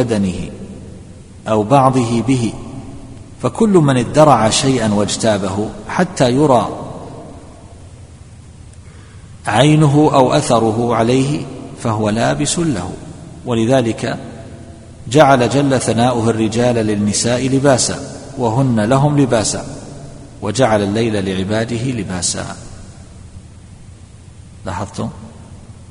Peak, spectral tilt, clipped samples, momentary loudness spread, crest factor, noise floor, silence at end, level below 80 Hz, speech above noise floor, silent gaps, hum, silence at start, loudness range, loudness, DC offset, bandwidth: 0 dBFS; -5.5 dB/octave; under 0.1%; 21 LU; 16 dB; -38 dBFS; 0 s; -40 dBFS; 24 dB; none; none; 0 s; 8 LU; -15 LUFS; 0.2%; 11 kHz